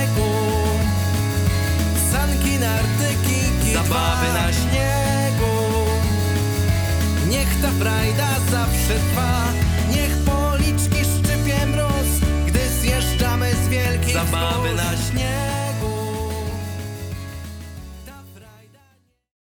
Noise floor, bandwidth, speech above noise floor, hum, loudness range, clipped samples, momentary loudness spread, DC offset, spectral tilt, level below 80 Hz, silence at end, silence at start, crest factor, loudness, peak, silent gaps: -59 dBFS; over 20 kHz; 40 dB; none; 6 LU; under 0.1%; 7 LU; under 0.1%; -5 dB/octave; -26 dBFS; 1 s; 0 s; 16 dB; -20 LUFS; -4 dBFS; none